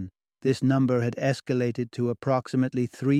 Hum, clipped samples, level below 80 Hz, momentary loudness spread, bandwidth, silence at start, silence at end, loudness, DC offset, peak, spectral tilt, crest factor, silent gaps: none; under 0.1%; -66 dBFS; 6 LU; 11.5 kHz; 0 s; 0 s; -26 LUFS; under 0.1%; -10 dBFS; -7.5 dB/octave; 16 dB; none